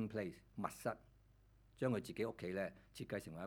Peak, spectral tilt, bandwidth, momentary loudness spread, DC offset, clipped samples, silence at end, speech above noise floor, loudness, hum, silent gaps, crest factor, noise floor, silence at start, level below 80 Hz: -24 dBFS; -6.5 dB/octave; 19 kHz; 7 LU; under 0.1%; under 0.1%; 0 s; 24 dB; -45 LUFS; none; none; 22 dB; -69 dBFS; 0 s; -70 dBFS